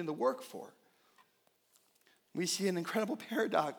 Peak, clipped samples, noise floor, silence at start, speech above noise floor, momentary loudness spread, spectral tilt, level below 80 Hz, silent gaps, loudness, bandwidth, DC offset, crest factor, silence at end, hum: -16 dBFS; under 0.1%; -74 dBFS; 0 s; 39 dB; 15 LU; -4 dB/octave; under -90 dBFS; none; -35 LUFS; over 20 kHz; under 0.1%; 22 dB; 0 s; none